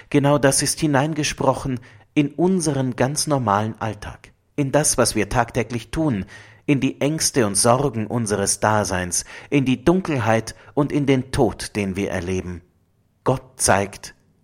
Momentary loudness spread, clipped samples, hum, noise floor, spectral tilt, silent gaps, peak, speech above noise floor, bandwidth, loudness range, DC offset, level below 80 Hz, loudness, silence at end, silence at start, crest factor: 11 LU; under 0.1%; none; -62 dBFS; -4.5 dB/octave; none; 0 dBFS; 42 dB; 16.5 kHz; 3 LU; under 0.1%; -44 dBFS; -20 LUFS; 0.3 s; 0.1 s; 20 dB